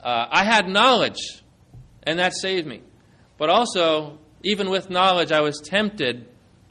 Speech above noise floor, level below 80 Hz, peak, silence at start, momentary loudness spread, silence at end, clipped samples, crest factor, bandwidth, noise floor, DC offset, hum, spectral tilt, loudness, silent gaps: 33 dB; -58 dBFS; -4 dBFS; 0.05 s; 15 LU; 0.45 s; under 0.1%; 18 dB; 11.5 kHz; -54 dBFS; under 0.1%; none; -3.5 dB/octave; -20 LUFS; none